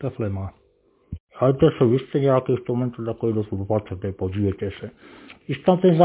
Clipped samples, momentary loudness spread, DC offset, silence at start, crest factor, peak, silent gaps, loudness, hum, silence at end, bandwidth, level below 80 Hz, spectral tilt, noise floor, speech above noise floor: under 0.1%; 19 LU; under 0.1%; 0 s; 20 dB; -2 dBFS; 1.20-1.27 s; -23 LUFS; none; 0 s; 4 kHz; -46 dBFS; -12 dB/octave; -61 dBFS; 40 dB